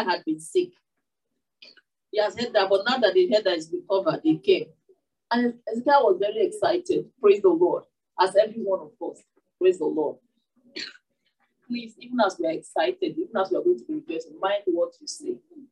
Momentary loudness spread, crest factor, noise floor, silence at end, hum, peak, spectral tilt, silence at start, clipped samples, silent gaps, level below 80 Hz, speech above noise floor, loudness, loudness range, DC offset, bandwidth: 15 LU; 18 dB; -83 dBFS; 0.1 s; none; -6 dBFS; -4.5 dB/octave; 0 s; under 0.1%; none; -78 dBFS; 59 dB; -24 LUFS; 7 LU; under 0.1%; 11.5 kHz